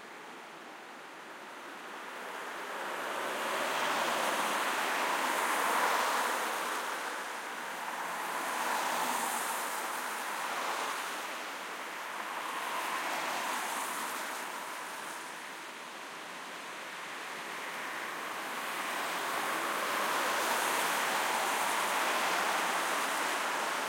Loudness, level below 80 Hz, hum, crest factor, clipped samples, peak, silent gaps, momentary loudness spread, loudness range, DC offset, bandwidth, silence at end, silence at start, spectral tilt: -33 LUFS; under -90 dBFS; none; 18 dB; under 0.1%; -18 dBFS; none; 13 LU; 9 LU; under 0.1%; 16.5 kHz; 0 s; 0 s; -0.5 dB/octave